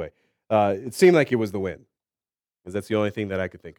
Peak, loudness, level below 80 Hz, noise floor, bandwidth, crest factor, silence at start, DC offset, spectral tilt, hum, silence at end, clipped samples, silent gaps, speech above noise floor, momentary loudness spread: -4 dBFS; -23 LUFS; -62 dBFS; under -90 dBFS; 16 kHz; 20 dB; 0 s; under 0.1%; -6 dB/octave; none; 0.05 s; under 0.1%; none; over 68 dB; 16 LU